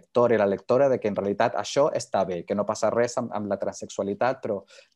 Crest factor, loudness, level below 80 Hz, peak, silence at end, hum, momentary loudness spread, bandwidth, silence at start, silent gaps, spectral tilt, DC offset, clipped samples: 16 dB; -25 LUFS; -72 dBFS; -8 dBFS; 0.35 s; none; 9 LU; 11.5 kHz; 0.15 s; none; -5 dB/octave; under 0.1%; under 0.1%